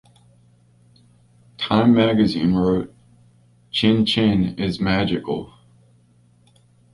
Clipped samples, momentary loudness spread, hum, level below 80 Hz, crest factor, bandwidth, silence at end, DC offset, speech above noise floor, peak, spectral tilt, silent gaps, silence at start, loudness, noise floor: under 0.1%; 12 LU; none; -46 dBFS; 18 dB; 11.5 kHz; 1.5 s; under 0.1%; 38 dB; -4 dBFS; -7 dB/octave; none; 1.6 s; -19 LUFS; -56 dBFS